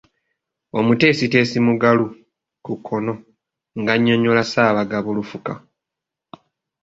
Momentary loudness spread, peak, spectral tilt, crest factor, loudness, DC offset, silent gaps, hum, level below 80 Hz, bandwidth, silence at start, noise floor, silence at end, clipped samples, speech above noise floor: 16 LU; -2 dBFS; -6.5 dB/octave; 18 dB; -18 LUFS; under 0.1%; none; none; -58 dBFS; 7.8 kHz; 0.75 s; -84 dBFS; 1.25 s; under 0.1%; 67 dB